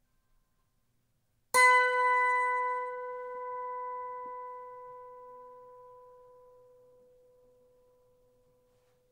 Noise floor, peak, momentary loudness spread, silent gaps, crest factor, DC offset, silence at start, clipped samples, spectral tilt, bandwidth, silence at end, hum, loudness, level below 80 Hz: -76 dBFS; -12 dBFS; 27 LU; none; 22 dB; under 0.1%; 1.55 s; under 0.1%; 1 dB/octave; 16 kHz; 3.1 s; none; -28 LUFS; -78 dBFS